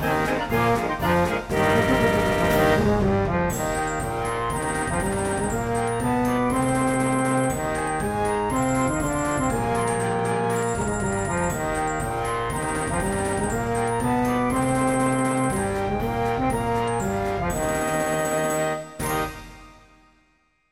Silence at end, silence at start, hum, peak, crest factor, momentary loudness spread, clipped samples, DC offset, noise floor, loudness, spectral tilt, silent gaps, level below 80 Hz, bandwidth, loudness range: 1 s; 0 s; none; -8 dBFS; 16 dB; 5 LU; under 0.1%; under 0.1%; -65 dBFS; -23 LUFS; -5.5 dB/octave; none; -38 dBFS; 16.5 kHz; 4 LU